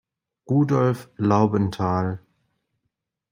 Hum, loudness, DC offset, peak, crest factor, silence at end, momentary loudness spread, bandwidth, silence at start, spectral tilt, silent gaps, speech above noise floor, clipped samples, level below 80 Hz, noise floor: none; -22 LUFS; under 0.1%; -4 dBFS; 18 dB; 1.15 s; 7 LU; 16 kHz; 0.5 s; -8.5 dB/octave; none; 58 dB; under 0.1%; -60 dBFS; -79 dBFS